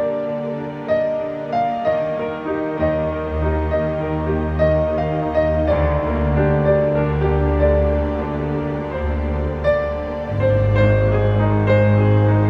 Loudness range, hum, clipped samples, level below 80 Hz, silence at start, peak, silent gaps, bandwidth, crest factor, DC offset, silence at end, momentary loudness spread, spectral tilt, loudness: 3 LU; none; under 0.1%; -28 dBFS; 0 s; -4 dBFS; none; 5.6 kHz; 14 dB; under 0.1%; 0 s; 8 LU; -10 dB/octave; -19 LUFS